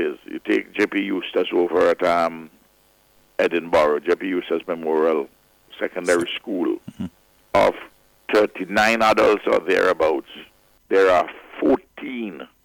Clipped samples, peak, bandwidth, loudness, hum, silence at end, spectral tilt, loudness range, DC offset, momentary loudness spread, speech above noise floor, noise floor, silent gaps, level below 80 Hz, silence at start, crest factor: under 0.1%; -8 dBFS; 17.5 kHz; -20 LUFS; none; 0.2 s; -4.5 dB/octave; 4 LU; under 0.1%; 15 LU; 38 dB; -58 dBFS; none; -56 dBFS; 0 s; 14 dB